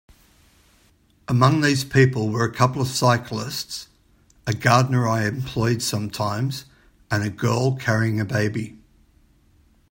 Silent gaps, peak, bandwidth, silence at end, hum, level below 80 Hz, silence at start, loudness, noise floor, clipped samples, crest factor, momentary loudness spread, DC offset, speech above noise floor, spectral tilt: none; -2 dBFS; 16.5 kHz; 1.2 s; none; -52 dBFS; 1.3 s; -21 LUFS; -59 dBFS; under 0.1%; 20 dB; 11 LU; under 0.1%; 38 dB; -5.5 dB/octave